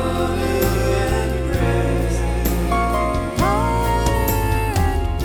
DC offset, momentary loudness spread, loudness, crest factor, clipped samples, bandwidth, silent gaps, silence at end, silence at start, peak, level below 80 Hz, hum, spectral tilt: under 0.1%; 2 LU; -20 LUFS; 14 dB; under 0.1%; 19 kHz; none; 0 s; 0 s; -6 dBFS; -24 dBFS; none; -6 dB/octave